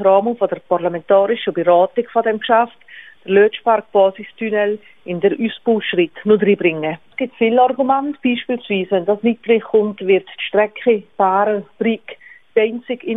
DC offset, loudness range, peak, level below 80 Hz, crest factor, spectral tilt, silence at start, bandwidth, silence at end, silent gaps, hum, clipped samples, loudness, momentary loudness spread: 0.2%; 2 LU; -2 dBFS; -64 dBFS; 16 dB; -9 dB/octave; 0 s; 3.9 kHz; 0 s; none; none; under 0.1%; -17 LUFS; 7 LU